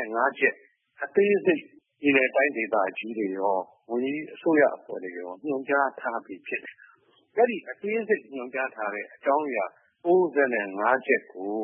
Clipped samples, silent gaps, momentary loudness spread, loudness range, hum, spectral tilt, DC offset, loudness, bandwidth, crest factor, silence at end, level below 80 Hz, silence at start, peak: under 0.1%; none; 12 LU; 4 LU; none; -9.5 dB/octave; under 0.1%; -26 LUFS; 3.6 kHz; 18 dB; 0 s; -86 dBFS; 0 s; -8 dBFS